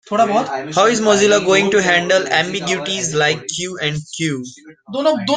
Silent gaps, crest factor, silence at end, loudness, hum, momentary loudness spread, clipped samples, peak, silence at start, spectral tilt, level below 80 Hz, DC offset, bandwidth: none; 16 dB; 0 s; -16 LUFS; none; 9 LU; under 0.1%; -2 dBFS; 0.1 s; -3.5 dB/octave; -56 dBFS; under 0.1%; 9.8 kHz